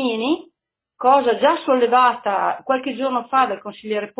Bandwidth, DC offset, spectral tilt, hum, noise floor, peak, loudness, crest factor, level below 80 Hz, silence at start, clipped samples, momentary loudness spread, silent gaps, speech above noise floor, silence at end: 4 kHz; under 0.1%; -8 dB/octave; none; -76 dBFS; -2 dBFS; -19 LUFS; 16 dB; -68 dBFS; 0 s; under 0.1%; 9 LU; none; 58 dB; 0.1 s